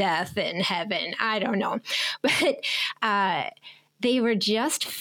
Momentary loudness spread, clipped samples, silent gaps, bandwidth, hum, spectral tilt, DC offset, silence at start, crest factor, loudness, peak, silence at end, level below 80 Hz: 5 LU; under 0.1%; none; 19 kHz; none; -3 dB/octave; under 0.1%; 0 s; 18 dB; -25 LUFS; -8 dBFS; 0 s; -72 dBFS